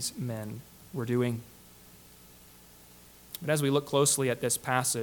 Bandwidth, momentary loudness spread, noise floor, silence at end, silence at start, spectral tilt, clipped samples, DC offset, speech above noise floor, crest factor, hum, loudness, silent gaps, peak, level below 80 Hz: 19 kHz; 17 LU; -54 dBFS; 0 s; 0 s; -4 dB/octave; under 0.1%; under 0.1%; 25 dB; 22 dB; 60 Hz at -55 dBFS; -29 LUFS; none; -10 dBFS; -64 dBFS